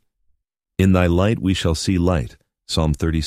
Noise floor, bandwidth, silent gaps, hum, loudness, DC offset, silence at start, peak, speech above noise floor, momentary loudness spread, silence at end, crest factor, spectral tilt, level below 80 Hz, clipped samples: -66 dBFS; 14.5 kHz; none; none; -19 LUFS; under 0.1%; 0.8 s; -2 dBFS; 48 dB; 8 LU; 0 s; 18 dB; -6 dB/octave; -32 dBFS; under 0.1%